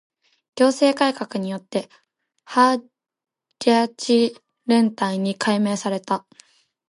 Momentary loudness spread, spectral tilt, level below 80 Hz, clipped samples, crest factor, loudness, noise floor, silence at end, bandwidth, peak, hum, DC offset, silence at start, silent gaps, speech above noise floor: 10 LU; -5 dB/octave; -74 dBFS; under 0.1%; 18 dB; -21 LUFS; -55 dBFS; 0.7 s; 11.5 kHz; -4 dBFS; none; under 0.1%; 0.55 s; none; 35 dB